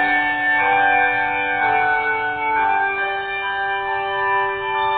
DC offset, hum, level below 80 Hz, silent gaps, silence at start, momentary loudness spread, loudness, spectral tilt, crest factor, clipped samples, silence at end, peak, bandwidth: under 0.1%; none; -52 dBFS; none; 0 s; 6 LU; -18 LUFS; -7 dB/octave; 14 dB; under 0.1%; 0 s; -6 dBFS; 4.6 kHz